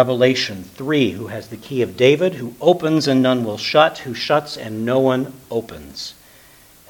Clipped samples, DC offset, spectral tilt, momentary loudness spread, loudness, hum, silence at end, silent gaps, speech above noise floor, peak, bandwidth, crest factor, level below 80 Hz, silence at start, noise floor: under 0.1%; under 0.1%; -5.5 dB/octave; 15 LU; -18 LUFS; none; 0.75 s; none; 29 dB; 0 dBFS; 19 kHz; 18 dB; -56 dBFS; 0 s; -47 dBFS